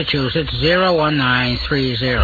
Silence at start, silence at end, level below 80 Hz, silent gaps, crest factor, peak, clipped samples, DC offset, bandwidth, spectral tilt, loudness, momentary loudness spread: 0 s; 0 s; -32 dBFS; none; 14 dB; -4 dBFS; under 0.1%; under 0.1%; 4.9 kHz; -7 dB/octave; -16 LUFS; 4 LU